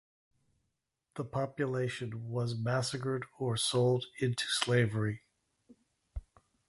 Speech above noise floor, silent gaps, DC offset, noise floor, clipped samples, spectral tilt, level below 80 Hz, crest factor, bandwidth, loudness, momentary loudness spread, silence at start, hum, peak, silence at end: 51 dB; none; under 0.1%; -84 dBFS; under 0.1%; -5 dB/octave; -58 dBFS; 24 dB; 11.5 kHz; -33 LUFS; 17 LU; 1.15 s; none; -12 dBFS; 0.5 s